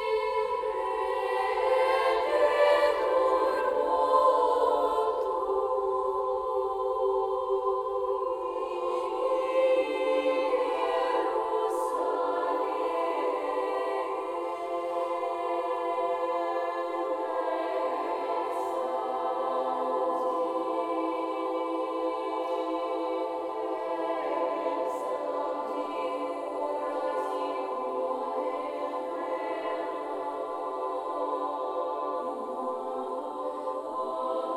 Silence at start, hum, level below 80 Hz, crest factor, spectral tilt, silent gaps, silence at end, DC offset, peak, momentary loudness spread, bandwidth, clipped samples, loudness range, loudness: 0 s; none; -66 dBFS; 18 dB; -4 dB/octave; none; 0 s; under 0.1%; -12 dBFS; 8 LU; 13.5 kHz; under 0.1%; 7 LU; -29 LUFS